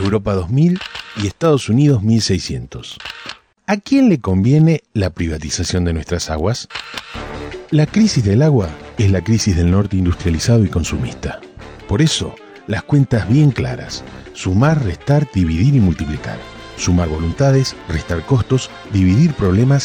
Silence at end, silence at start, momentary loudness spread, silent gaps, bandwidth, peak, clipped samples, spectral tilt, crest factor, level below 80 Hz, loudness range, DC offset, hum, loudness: 0 s; 0 s; 15 LU; none; 10 kHz; -4 dBFS; under 0.1%; -6.5 dB/octave; 12 dB; -32 dBFS; 2 LU; under 0.1%; none; -16 LUFS